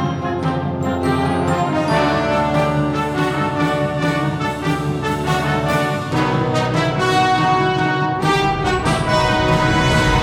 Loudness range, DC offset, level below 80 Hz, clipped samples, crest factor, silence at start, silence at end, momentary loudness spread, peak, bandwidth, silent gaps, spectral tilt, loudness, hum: 3 LU; under 0.1%; -34 dBFS; under 0.1%; 14 dB; 0 s; 0 s; 6 LU; -4 dBFS; 16 kHz; none; -6 dB/octave; -18 LUFS; none